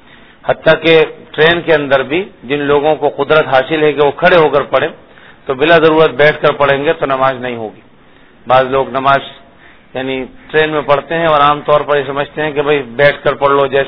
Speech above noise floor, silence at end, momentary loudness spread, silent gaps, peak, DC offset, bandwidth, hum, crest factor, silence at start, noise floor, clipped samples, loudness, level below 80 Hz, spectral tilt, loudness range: 32 dB; 0 s; 11 LU; none; 0 dBFS; under 0.1%; 5.4 kHz; none; 12 dB; 0.45 s; -44 dBFS; 0.4%; -12 LUFS; -42 dBFS; -7.5 dB/octave; 4 LU